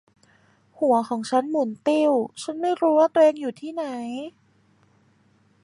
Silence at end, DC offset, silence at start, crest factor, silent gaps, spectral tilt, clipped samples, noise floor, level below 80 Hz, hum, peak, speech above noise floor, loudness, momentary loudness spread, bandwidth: 1.35 s; under 0.1%; 0.8 s; 18 dB; none; -5 dB/octave; under 0.1%; -61 dBFS; -76 dBFS; none; -6 dBFS; 39 dB; -23 LUFS; 13 LU; 11 kHz